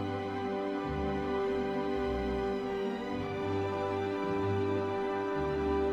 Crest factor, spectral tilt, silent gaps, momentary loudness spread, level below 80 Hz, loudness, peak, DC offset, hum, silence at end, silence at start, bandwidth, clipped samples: 12 dB; -7.5 dB/octave; none; 4 LU; -48 dBFS; -33 LUFS; -20 dBFS; under 0.1%; none; 0 s; 0 s; 8.2 kHz; under 0.1%